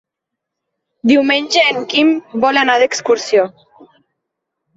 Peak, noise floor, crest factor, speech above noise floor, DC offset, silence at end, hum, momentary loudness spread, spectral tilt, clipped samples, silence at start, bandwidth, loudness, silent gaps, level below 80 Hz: 0 dBFS; -80 dBFS; 16 dB; 66 dB; under 0.1%; 1.25 s; none; 4 LU; -3 dB/octave; under 0.1%; 1.05 s; 8 kHz; -14 LUFS; none; -64 dBFS